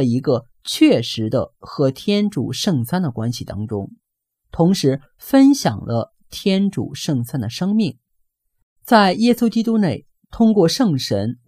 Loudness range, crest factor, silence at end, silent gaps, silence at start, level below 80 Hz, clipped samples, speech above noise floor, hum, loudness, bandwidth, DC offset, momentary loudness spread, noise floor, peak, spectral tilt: 4 LU; 18 dB; 0.15 s; 8.63-8.76 s; 0 s; -50 dBFS; under 0.1%; 57 dB; none; -18 LUFS; 16 kHz; under 0.1%; 12 LU; -74 dBFS; 0 dBFS; -6 dB/octave